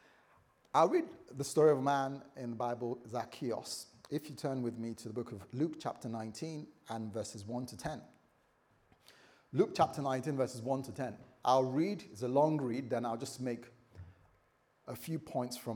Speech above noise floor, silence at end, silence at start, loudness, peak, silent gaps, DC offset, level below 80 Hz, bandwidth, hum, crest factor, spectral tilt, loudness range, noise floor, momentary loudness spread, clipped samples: 37 dB; 0 s; 0.75 s; -36 LUFS; -16 dBFS; none; under 0.1%; -76 dBFS; over 20 kHz; none; 22 dB; -6 dB/octave; 8 LU; -73 dBFS; 14 LU; under 0.1%